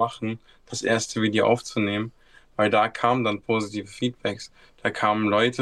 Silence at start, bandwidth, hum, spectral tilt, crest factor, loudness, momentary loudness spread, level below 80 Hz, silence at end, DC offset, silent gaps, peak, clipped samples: 0 s; 12.5 kHz; none; -4.5 dB/octave; 20 dB; -24 LUFS; 13 LU; -60 dBFS; 0 s; under 0.1%; none; -4 dBFS; under 0.1%